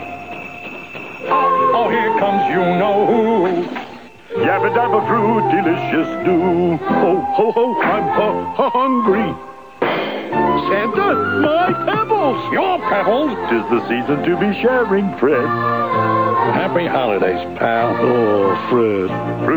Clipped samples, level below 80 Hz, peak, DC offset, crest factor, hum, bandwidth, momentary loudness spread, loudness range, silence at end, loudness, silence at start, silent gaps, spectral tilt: under 0.1%; -54 dBFS; -2 dBFS; 0.4%; 14 dB; none; over 20 kHz; 6 LU; 1 LU; 0 s; -16 LUFS; 0 s; none; -8 dB/octave